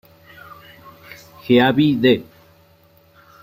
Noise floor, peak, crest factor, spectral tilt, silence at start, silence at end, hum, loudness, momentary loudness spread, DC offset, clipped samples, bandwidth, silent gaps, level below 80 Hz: -53 dBFS; 0 dBFS; 20 dB; -7.5 dB/octave; 1.45 s; 1.2 s; none; -16 LUFS; 26 LU; under 0.1%; under 0.1%; 16 kHz; none; -56 dBFS